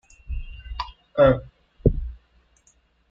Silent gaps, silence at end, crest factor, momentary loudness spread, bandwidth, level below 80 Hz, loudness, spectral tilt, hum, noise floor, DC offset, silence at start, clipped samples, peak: none; 0.95 s; 22 dB; 19 LU; 7.4 kHz; -34 dBFS; -23 LUFS; -8.5 dB/octave; none; -62 dBFS; under 0.1%; 0.3 s; under 0.1%; -4 dBFS